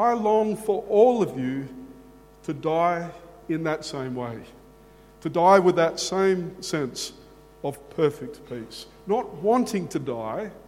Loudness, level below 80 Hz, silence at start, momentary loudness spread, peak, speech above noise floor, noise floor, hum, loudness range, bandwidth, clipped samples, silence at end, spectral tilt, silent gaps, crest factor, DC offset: -24 LUFS; -58 dBFS; 0 s; 19 LU; -2 dBFS; 27 dB; -51 dBFS; none; 6 LU; 16 kHz; under 0.1%; 0.05 s; -5.5 dB/octave; none; 22 dB; under 0.1%